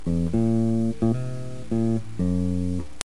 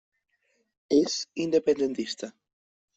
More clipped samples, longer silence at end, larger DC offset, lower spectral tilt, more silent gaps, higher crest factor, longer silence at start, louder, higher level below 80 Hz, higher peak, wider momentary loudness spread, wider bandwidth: neither; second, 0 s vs 0.65 s; first, 3% vs under 0.1%; first, -8 dB/octave vs -4 dB/octave; neither; first, 24 dB vs 18 dB; second, 0 s vs 0.9 s; about the same, -25 LUFS vs -27 LUFS; first, -42 dBFS vs -70 dBFS; first, 0 dBFS vs -10 dBFS; second, 7 LU vs 11 LU; first, 12 kHz vs 8.2 kHz